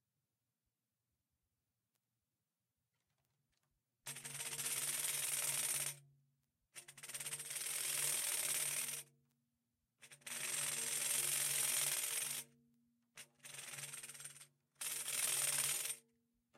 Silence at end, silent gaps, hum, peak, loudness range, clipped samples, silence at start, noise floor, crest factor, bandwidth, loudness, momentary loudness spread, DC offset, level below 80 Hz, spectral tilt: 0.6 s; none; none; -22 dBFS; 7 LU; under 0.1%; 4.05 s; under -90 dBFS; 24 dB; 16.5 kHz; -39 LUFS; 19 LU; under 0.1%; under -90 dBFS; 1 dB/octave